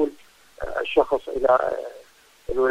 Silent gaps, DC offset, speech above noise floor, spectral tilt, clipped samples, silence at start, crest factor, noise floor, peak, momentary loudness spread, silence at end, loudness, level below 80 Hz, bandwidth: none; under 0.1%; 31 dB; -5 dB/octave; under 0.1%; 0 s; 18 dB; -52 dBFS; -6 dBFS; 17 LU; 0 s; -23 LUFS; -46 dBFS; 15 kHz